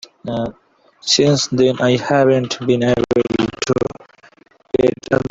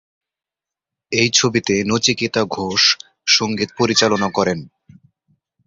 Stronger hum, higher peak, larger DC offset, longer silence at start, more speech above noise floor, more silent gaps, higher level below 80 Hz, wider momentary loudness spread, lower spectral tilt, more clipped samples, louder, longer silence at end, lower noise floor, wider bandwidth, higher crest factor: neither; about the same, -2 dBFS vs 0 dBFS; neither; second, 0.25 s vs 1.1 s; second, 35 dB vs 70 dB; neither; first, -48 dBFS vs -54 dBFS; first, 10 LU vs 7 LU; first, -5 dB/octave vs -3 dB/octave; neither; about the same, -17 LUFS vs -16 LUFS; second, 0 s vs 1 s; second, -50 dBFS vs -88 dBFS; about the same, 8 kHz vs 7.8 kHz; about the same, 16 dB vs 20 dB